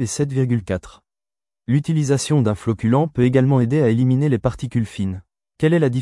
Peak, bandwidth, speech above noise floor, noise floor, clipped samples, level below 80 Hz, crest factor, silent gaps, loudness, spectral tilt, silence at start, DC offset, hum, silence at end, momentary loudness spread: -4 dBFS; 12 kHz; over 72 dB; under -90 dBFS; under 0.1%; -48 dBFS; 14 dB; none; -19 LUFS; -7 dB/octave; 0 s; under 0.1%; none; 0 s; 10 LU